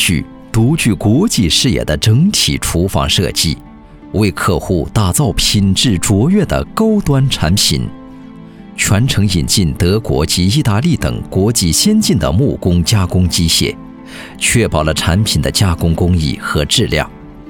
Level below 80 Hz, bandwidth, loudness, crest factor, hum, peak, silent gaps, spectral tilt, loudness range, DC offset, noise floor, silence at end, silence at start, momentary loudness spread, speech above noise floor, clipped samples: -28 dBFS; 19 kHz; -13 LUFS; 14 dB; none; 0 dBFS; none; -4.5 dB/octave; 2 LU; 0.1%; -33 dBFS; 0 s; 0 s; 6 LU; 21 dB; under 0.1%